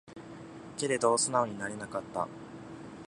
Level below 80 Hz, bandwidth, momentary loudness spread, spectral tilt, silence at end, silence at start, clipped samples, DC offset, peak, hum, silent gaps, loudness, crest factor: -68 dBFS; 11.5 kHz; 20 LU; -3 dB/octave; 0 s; 0.05 s; under 0.1%; under 0.1%; -12 dBFS; none; none; -31 LUFS; 22 dB